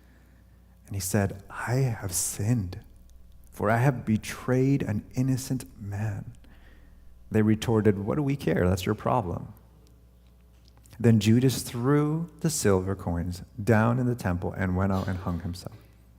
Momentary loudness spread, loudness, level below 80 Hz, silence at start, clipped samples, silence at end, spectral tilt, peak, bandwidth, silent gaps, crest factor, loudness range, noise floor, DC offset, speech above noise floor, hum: 12 LU; -27 LUFS; -52 dBFS; 0.85 s; under 0.1%; 0.4 s; -6 dB/octave; -8 dBFS; 16.5 kHz; none; 20 dB; 4 LU; -55 dBFS; under 0.1%; 29 dB; none